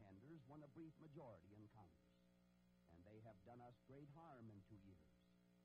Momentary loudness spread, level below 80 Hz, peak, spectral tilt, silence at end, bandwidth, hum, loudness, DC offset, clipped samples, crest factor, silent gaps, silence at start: 5 LU; -84 dBFS; -50 dBFS; -7.5 dB/octave; 0 s; 5.2 kHz; 60 Hz at -80 dBFS; -65 LUFS; under 0.1%; under 0.1%; 16 dB; none; 0 s